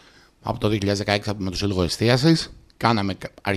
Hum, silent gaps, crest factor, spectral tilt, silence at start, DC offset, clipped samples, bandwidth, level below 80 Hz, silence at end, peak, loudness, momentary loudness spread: none; none; 20 dB; -5.5 dB/octave; 0.45 s; under 0.1%; under 0.1%; 15 kHz; -44 dBFS; 0 s; -2 dBFS; -22 LUFS; 11 LU